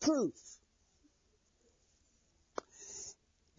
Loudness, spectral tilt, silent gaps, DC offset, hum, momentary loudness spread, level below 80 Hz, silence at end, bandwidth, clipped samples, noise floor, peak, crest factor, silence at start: -41 LUFS; -4.5 dB/octave; none; under 0.1%; none; 21 LU; -74 dBFS; 0.45 s; 7.4 kHz; under 0.1%; -74 dBFS; -20 dBFS; 22 dB; 0 s